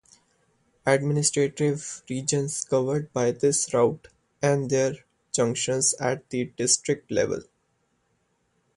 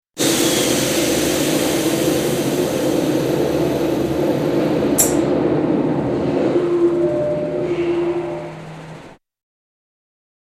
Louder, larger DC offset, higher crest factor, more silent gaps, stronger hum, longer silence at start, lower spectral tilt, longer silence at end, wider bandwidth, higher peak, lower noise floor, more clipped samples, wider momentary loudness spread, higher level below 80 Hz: second, -25 LUFS vs -18 LUFS; neither; about the same, 20 dB vs 18 dB; neither; neither; first, 0.85 s vs 0.15 s; about the same, -4 dB/octave vs -4.5 dB/octave; about the same, 1.35 s vs 1.35 s; second, 11.5 kHz vs 15.5 kHz; second, -6 dBFS vs -2 dBFS; first, -71 dBFS vs -40 dBFS; neither; about the same, 8 LU vs 6 LU; second, -62 dBFS vs -46 dBFS